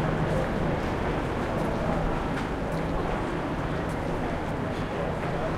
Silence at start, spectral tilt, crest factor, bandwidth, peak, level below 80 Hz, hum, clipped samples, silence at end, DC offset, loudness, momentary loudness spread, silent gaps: 0 s; -7 dB/octave; 14 dB; 14 kHz; -14 dBFS; -36 dBFS; none; under 0.1%; 0 s; under 0.1%; -29 LUFS; 3 LU; none